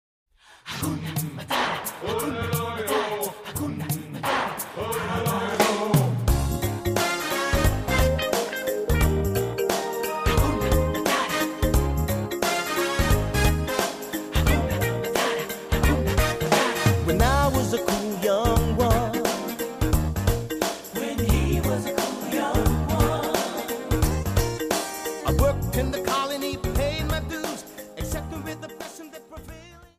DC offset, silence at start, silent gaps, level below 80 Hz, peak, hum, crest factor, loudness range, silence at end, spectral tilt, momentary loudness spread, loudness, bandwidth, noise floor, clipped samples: under 0.1%; 0.65 s; none; -30 dBFS; -6 dBFS; none; 18 dB; 5 LU; 0.15 s; -5 dB/octave; 9 LU; -25 LUFS; 15.5 kHz; -44 dBFS; under 0.1%